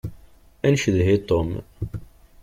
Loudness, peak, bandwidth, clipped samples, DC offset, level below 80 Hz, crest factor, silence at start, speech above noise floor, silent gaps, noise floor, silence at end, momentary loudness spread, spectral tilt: -22 LUFS; -6 dBFS; 14.5 kHz; under 0.1%; under 0.1%; -42 dBFS; 16 dB; 0.05 s; 28 dB; none; -49 dBFS; 0.4 s; 15 LU; -6.5 dB/octave